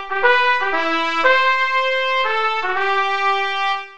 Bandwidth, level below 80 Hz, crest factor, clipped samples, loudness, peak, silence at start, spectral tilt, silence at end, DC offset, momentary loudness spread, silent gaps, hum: 8.8 kHz; -58 dBFS; 16 dB; under 0.1%; -17 LUFS; -2 dBFS; 0 s; -1.5 dB/octave; 0 s; 3%; 5 LU; none; none